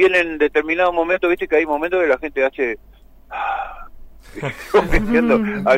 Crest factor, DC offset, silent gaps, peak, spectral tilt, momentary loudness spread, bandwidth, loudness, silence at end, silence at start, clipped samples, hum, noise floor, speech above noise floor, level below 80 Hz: 14 dB; under 0.1%; none; -4 dBFS; -6 dB/octave; 12 LU; 16 kHz; -18 LUFS; 0 s; 0 s; under 0.1%; none; -38 dBFS; 20 dB; -32 dBFS